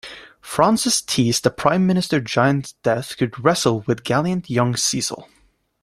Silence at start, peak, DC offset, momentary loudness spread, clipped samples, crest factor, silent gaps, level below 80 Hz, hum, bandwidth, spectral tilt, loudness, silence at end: 0.05 s; -2 dBFS; under 0.1%; 7 LU; under 0.1%; 18 dB; none; -54 dBFS; none; 16 kHz; -4.5 dB/octave; -19 LUFS; 0.6 s